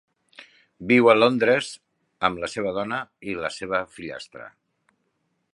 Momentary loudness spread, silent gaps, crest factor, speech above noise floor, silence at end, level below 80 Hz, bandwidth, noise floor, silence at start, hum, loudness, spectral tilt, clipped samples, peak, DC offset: 21 LU; none; 22 dB; 51 dB; 1.05 s; -60 dBFS; 11 kHz; -73 dBFS; 0.4 s; none; -22 LUFS; -5 dB/octave; under 0.1%; -2 dBFS; under 0.1%